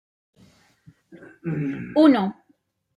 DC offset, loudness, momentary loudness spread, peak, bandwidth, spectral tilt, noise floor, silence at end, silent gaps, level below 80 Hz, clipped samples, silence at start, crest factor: under 0.1%; -21 LUFS; 14 LU; -4 dBFS; 5.2 kHz; -8.5 dB/octave; -65 dBFS; 0.65 s; none; -64 dBFS; under 0.1%; 1.15 s; 20 dB